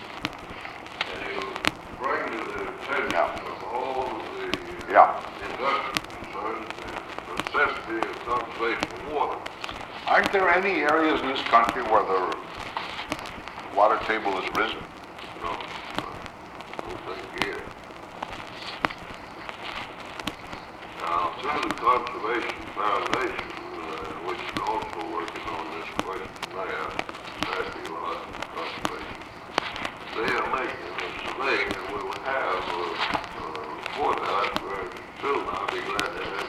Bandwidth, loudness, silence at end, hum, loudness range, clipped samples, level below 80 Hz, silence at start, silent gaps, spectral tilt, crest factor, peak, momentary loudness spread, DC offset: 16.5 kHz; -28 LUFS; 0 s; none; 10 LU; under 0.1%; -54 dBFS; 0 s; none; -4 dB/octave; 28 dB; 0 dBFS; 14 LU; under 0.1%